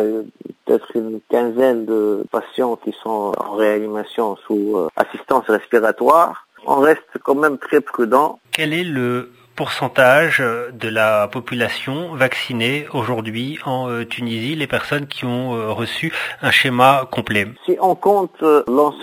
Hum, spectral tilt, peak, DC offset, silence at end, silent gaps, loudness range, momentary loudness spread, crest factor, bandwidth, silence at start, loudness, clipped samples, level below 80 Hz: none; -5.5 dB/octave; 0 dBFS; under 0.1%; 0 s; none; 5 LU; 10 LU; 18 dB; 16 kHz; 0 s; -18 LUFS; under 0.1%; -58 dBFS